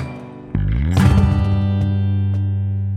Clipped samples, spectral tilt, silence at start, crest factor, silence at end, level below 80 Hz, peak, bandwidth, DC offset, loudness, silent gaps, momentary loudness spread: under 0.1%; -8 dB/octave; 0 s; 14 dB; 0 s; -26 dBFS; -2 dBFS; 10 kHz; under 0.1%; -18 LUFS; none; 11 LU